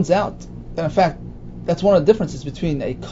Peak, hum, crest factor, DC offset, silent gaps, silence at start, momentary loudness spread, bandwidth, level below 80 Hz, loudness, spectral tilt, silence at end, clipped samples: 0 dBFS; 60 Hz at -40 dBFS; 18 dB; under 0.1%; none; 0 s; 17 LU; 7.8 kHz; -38 dBFS; -20 LUFS; -7 dB/octave; 0 s; under 0.1%